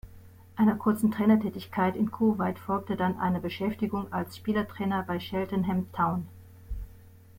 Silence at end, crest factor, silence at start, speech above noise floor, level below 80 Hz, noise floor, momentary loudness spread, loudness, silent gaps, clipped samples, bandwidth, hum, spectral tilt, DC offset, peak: 0.3 s; 18 dB; 0.05 s; 24 dB; -50 dBFS; -51 dBFS; 14 LU; -28 LUFS; none; under 0.1%; 16.5 kHz; none; -7.5 dB/octave; under 0.1%; -12 dBFS